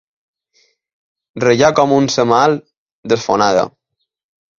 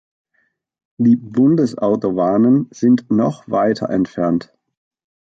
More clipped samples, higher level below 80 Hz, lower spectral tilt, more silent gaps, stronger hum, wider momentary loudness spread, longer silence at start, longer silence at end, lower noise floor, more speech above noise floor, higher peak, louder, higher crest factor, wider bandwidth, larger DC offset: neither; about the same, -54 dBFS vs -56 dBFS; second, -5 dB/octave vs -8.5 dB/octave; first, 2.77-2.86 s, 2.92-3.03 s vs none; neither; first, 13 LU vs 5 LU; first, 1.35 s vs 1 s; first, 0.9 s vs 0.75 s; second, -59 dBFS vs -66 dBFS; second, 46 dB vs 50 dB; first, 0 dBFS vs -4 dBFS; about the same, -14 LUFS vs -16 LUFS; about the same, 16 dB vs 12 dB; about the same, 7.4 kHz vs 7.8 kHz; neither